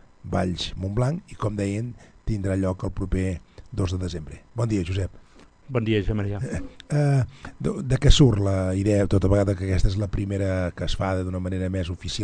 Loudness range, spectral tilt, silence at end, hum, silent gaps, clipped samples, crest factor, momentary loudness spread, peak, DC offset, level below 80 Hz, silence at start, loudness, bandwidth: 6 LU; -6.5 dB/octave; 0 s; none; none; under 0.1%; 22 dB; 11 LU; -2 dBFS; under 0.1%; -32 dBFS; 0.25 s; -25 LUFS; 10 kHz